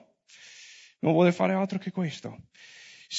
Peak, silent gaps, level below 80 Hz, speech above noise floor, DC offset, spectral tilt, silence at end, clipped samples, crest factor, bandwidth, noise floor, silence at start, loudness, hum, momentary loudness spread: -10 dBFS; none; -74 dBFS; 28 dB; under 0.1%; -6.5 dB/octave; 0 s; under 0.1%; 20 dB; 8 kHz; -54 dBFS; 0.45 s; -26 LUFS; none; 26 LU